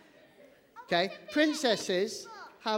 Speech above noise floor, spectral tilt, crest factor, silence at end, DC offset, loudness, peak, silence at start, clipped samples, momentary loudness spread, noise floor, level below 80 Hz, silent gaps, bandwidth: 29 dB; -3.5 dB/octave; 20 dB; 0 s; under 0.1%; -30 LUFS; -12 dBFS; 0.75 s; under 0.1%; 12 LU; -59 dBFS; -76 dBFS; none; 16.5 kHz